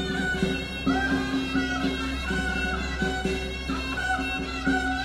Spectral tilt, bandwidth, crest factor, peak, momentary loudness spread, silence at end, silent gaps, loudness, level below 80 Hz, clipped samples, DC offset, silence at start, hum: -5 dB/octave; 14 kHz; 16 dB; -12 dBFS; 4 LU; 0 s; none; -27 LUFS; -36 dBFS; under 0.1%; under 0.1%; 0 s; none